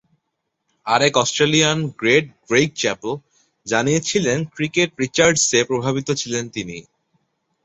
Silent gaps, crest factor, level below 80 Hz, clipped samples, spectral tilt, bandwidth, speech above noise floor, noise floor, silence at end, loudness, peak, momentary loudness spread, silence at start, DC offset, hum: none; 18 dB; -56 dBFS; under 0.1%; -3.5 dB/octave; 8.4 kHz; 57 dB; -76 dBFS; 0.85 s; -18 LUFS; -2 dBFS; 13 LU; 0.85 s; under 0.1%; none